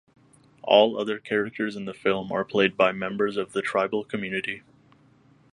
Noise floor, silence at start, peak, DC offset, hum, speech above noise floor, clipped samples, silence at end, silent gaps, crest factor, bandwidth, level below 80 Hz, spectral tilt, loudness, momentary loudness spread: -58 dBFS; 0.65 s; -2 dBFS; under 0.1%; none; 33 dB; under 0.1%; 0.95 s; none; 24 dB; 11 kHz; -66 dBFS; -5.5 dB/octave; -25 LUFS; 11 LU